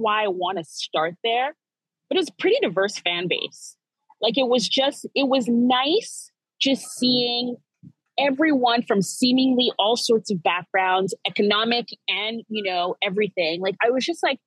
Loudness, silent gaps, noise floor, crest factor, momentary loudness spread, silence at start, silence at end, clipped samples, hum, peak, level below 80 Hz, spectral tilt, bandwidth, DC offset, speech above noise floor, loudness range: -22 LUFS; none; -85 dBFS; 18 dB; 8 LU; 0 s; 0.1 s; under 0.1%; none; -6 dBFS; under -90 dBFS; -3.5 dB/octave; 12.5 kHz; under 0.1%; 63 dB; 3 LU